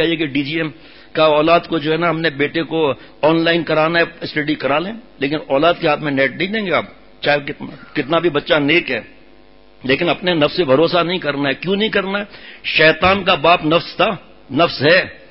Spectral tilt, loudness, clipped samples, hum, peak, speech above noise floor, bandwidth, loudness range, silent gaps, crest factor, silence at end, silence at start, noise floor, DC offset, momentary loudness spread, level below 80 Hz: -10 dB/octave; -16 LUFS; under 0.1%; none; 0 dBFS; 31 dB; 5.8 kHz; 3 LU; none; 16 dB; 0.15 s; 0 s; -48 dBFS; 0.4%; 11 LU; -48 dBFS